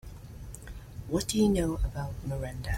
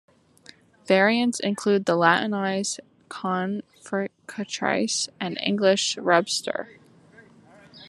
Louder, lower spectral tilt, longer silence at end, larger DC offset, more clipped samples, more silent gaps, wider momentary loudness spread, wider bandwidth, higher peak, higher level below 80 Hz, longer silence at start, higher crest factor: second, -30 LUFS vs -24 LUFS; first, -5.5 dB/octave vs -3.5 dB/octave; about the same, 0 s vs 0 s; neither; neither; neither; first, 19 LU vs 13 LU; first, 16.5 kHz vs 12.5 kHz; second, -14 dBFS vs -4 dBFS; first, -40 dBFS vs -74 dBFS; second, 0.05 s vs 0.85 s; second, 16 dB vs 22 dB